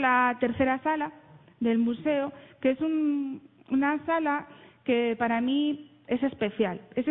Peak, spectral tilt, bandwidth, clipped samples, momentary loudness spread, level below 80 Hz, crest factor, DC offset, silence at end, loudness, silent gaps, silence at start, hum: -10 dBFS; -9.5 dB/octave; 4 kHz; under 0.1%; 7 LU; -64 dBFS; 16 dB; under 0.1%; 0 s; -28 LUFS; none; 0 s; none